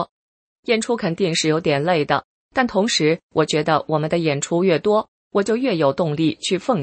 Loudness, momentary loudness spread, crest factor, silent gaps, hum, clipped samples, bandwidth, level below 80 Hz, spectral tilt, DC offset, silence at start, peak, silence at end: -20 LUFS; 5 LU; 18 dB; 0.09-0.63 s, 2.24-2.49 s, 3.23-3.29 s, 5.08-5.31 s; none; under 0.1%; 8.8 kHz; -58 dBFS; -4.5 dB/octave; under 0.1%; 0 s; -2 dBFS; 0 s